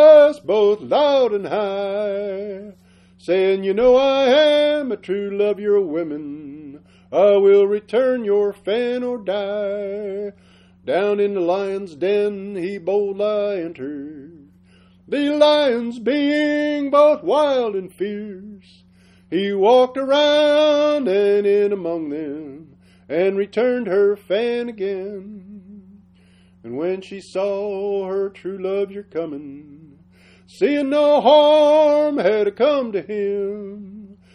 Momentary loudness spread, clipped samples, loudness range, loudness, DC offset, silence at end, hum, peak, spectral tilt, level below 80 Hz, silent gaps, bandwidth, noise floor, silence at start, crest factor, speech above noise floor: 16 LU; under 0.1%; 9 LU; -18 LUFS; under 0.1%; 0.2 s; none; -2 dBFS; -5.5 dB/octave; -60 dBFS; none; 10 kHz; -52 dBFS; 0 s; 18 dB; 33 dB